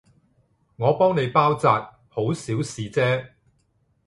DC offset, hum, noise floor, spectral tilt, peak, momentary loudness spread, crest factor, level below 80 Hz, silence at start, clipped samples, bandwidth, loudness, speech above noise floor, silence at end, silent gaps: under 0.1%; none; -66 dBFS; -6 dB/octave; -4 dBFS; 9 LU; 20 dB; -60 dBFS; 0.8 s; under 0.1%; 11.5 kHz; -22 LUFS; 45 dB; 0.8 s; none